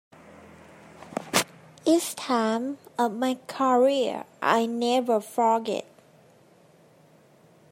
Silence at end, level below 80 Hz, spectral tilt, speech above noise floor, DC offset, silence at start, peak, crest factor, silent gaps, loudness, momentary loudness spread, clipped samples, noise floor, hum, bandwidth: 1.9 s; -76 dBFS; -3.5 dB/octave; 32 dB; under 0.1%; 1 s; -6 dBFS; 22 dB; none; -25 LUFS; 10 LU; under 0.1%; -57 dBFS; none; 16 kHz